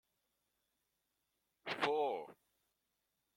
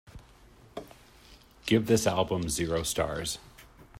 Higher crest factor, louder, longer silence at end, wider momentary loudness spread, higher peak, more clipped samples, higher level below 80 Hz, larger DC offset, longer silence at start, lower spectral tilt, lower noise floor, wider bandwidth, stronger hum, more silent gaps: about the same, 24 dB vs 22 dB; second, -39 LUFS vs -29 LUFS; first, 1.05 s vs 0 s; second, 16 LU vs 20 LU; second, -20 dBFS vs -10 dBFS; neither; second, -88 dBFS vs -52 dBFS; neither; first, 1.65 s vs 0.15 s; about the same, -4 dB/octave vs -4.5 dB/octave; first, -86 dBFS vs -56 dBFS; about the same, 16.5 kHz vs 16 kHz; neither; neither